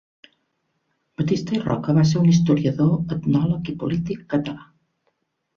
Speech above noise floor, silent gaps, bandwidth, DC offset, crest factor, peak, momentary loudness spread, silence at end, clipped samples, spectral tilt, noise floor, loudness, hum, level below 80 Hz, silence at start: 52 dB; none; 7.2 kHz; under 0.1%; 16 dB; -6 dBFS; 10 LU; 0.95 s; under 0.1%; -7.5 dB/octave; -72 dBFS; -21 LUFS; none; -52 dBFS; 1.2 s